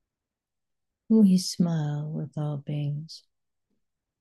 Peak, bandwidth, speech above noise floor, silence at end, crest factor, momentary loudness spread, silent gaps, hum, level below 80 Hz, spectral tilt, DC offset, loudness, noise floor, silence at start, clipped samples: -10 dBFS; 12.5 kHz; 62 dB; 1.05 s; 18 dB; 16 LU; none; none; -72 dBFS; -7 dB/octave; under 0.1%; -26 LUFS; -87 dBFS; 1.1 s; under 0.1%